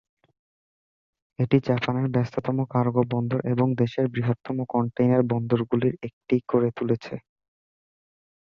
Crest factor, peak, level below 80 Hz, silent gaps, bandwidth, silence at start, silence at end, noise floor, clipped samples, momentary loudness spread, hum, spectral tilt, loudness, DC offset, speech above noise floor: 20 dB; -6 dBFS; -60 dBFS; 6.13-6.21 s; 6.6 kHz; 1.4 s; 1.35 s; under -90 dBFS; under 0.1%; 6 LU; none; -9.5 dB/octave; -25 LUFS; under 0.1%; over 66 dB